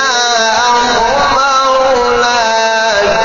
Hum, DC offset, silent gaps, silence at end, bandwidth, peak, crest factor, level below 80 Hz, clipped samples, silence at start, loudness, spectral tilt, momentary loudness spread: none; under 0.1%; none; 0 s; 7.4 kHz; 0 dBFS; 10 dB; -36 dBFS; under 0.1%; 0 s; -10 LUFS; 0.5 dB/octave; 1 LU